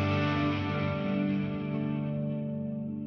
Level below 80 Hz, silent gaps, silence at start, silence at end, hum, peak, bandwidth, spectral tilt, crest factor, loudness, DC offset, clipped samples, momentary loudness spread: -60 dBFS; none; 0 s; 0 s; none; -16 dBFS; 6.4 kHz; -8.5 dB/octave; 14 dB; -31 LUFS; under 0.1%; under 0.1%; 6 LU